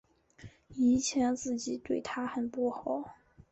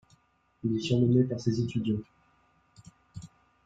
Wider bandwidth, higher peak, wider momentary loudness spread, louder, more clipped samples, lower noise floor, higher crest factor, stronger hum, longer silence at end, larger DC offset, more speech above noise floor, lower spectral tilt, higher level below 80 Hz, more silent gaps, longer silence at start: about the same, 8.2 kHz vs 7.8 kHz; second, -18 dBFS vs -12 dBFS; second, 10 LU vs 24 LU; second, -32 LUFS vs -29 LUFS; neither; second, -55 dBFS vs -67 dBFS; about the same, 14 dB vs 18 dB; neither; second, 0.1 s vs 0.4 s; neither; second, 23 dB vs 40 dB; second, -4 dB/octave vs -7.5 dB/octave; about the same, -62 dBFS vs -62 dBFS; neither; second, 0.4 s vs 0.65 s